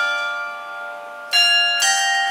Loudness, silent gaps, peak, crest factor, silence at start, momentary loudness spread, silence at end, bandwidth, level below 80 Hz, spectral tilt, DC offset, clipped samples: -16 LUFS; none; -4 dBFS; 16 dB; 0 s; 17 LU; 0 s; 16.5 kHz; under -90 dBFS; 4 dB/octave; under 0.1%; under 0.1%